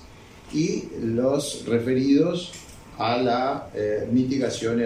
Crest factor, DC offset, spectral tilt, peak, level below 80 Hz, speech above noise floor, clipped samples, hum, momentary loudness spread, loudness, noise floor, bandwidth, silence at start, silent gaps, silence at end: 16 dB; under 0.1%; -5.5 dB/octave; -8 dBFS; -54 dBFS; 23 dB; under 0.1%; none; 10 LU; -24 LUFS; -46 dBFS; 14.5 kHz; 0 s; none; 0 s